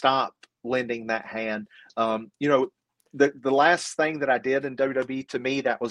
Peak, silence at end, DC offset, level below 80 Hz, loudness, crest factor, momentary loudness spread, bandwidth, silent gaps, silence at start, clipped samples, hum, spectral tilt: -6 dBFS; 0 s; under 0.1%; -70 dBFS; -25 LUFS; 20 dB; 10 LU; 11.5 kHz; none; 0 s; under 0.1%; none; -4.5 dB/octave